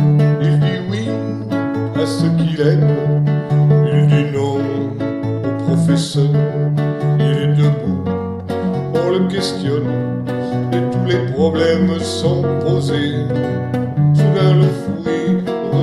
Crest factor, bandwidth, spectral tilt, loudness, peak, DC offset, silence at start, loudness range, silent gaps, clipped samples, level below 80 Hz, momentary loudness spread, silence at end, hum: 14 dB; 11.5 kHz; -7.5 dB/octave; -16 LUFS; -2 dBFS; under 0.1%; 0 s; 3 LU; none; under 0.1%; -50 dBFS; 8 LU; 0 s; none